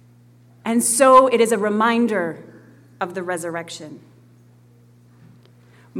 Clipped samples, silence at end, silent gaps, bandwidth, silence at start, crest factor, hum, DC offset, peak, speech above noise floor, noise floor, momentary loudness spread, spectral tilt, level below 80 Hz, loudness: under 0.1%; 0 s; none; 17.5 kHz; 0.65 s; 20 dB; 60 Hz at -45 dBFS; under 0.1%; -2 dBFS; 33 dB; -51 dBFS; 22 LU; -3.5 dB/octave; -64 dBFS; -18 LUFS